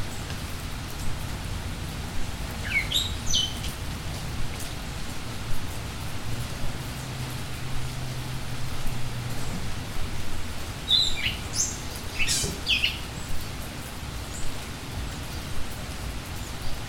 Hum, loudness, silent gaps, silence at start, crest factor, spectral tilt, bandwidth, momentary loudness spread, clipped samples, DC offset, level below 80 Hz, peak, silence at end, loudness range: none; -30 LUFS; none; 0 s; 20 dB; -2.5 dB/octave; 17 kHz; 11 LU; under 0.1%; 0.1%; -36 dBFS; -8 dBFS; 0 s; 9 LU